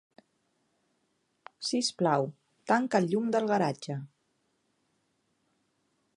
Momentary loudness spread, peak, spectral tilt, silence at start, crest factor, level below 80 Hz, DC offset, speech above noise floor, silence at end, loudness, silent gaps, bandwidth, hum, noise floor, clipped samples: 12 LU; -12 dBFS; -5 dB/octave; 1.6 s; 22 dB; -82 dBFS; under 0.1%; 48 dB; 2.1 s; -29 LUFS; none; 11.5 kHz; none; -76 dBFS; under 0.1%